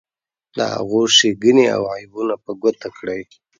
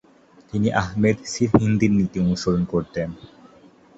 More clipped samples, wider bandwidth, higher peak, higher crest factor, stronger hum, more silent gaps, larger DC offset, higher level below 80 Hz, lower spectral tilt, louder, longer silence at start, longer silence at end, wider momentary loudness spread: neither; first, 9.4 kHz vs 8 kHz; about the same, 0 dBFS vs -2 dBFS; about the same, 18 dB vs 20 dB; neither; neither; neither; second, -60 dBFS vs -44 dBFS; second, -3 dB/octave vs -6.5 dB/octave; first, -17 LUFS vs -22 LUFS; about the same, 0.55 s vs 0.55 s; second, 0.35 s vs 0.7 s; first, 15 LU vs 11 LU